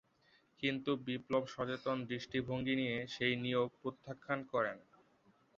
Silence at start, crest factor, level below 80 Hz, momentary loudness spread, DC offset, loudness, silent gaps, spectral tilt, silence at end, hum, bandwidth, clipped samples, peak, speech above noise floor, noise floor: 0.6 s; 18 dB; -72 dBFS; 5 LU; under 0.1%; -38 LUFS; none; -4 dB/octave; 0.75 s; none; 7.4 kHz; under 0.1%; -20 dBFS; 34 dB; -72 dBFS